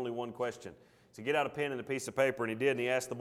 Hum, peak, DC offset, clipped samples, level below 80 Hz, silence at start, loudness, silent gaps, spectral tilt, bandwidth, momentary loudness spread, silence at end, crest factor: none; -16 dBFS; under 0.1%; under 0.1%; -74 dBFS; 0 s; -34 LUFS; none; -4.5 dB/octave; 16 kHz; 8 LU; 0 s; 18 dB